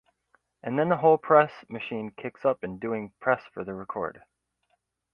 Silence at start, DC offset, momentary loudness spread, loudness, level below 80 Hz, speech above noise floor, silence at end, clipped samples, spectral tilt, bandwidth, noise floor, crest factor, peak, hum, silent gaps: 0.65 s; under 0.1%; 16 LU; -27 LUFS; -66 dBFS; 48 dB; 1.05 s; under 0.1%; -9 dB/octave; 5.6 kHz; -75 dBFS; 22 dB; -6 dBFS; none; none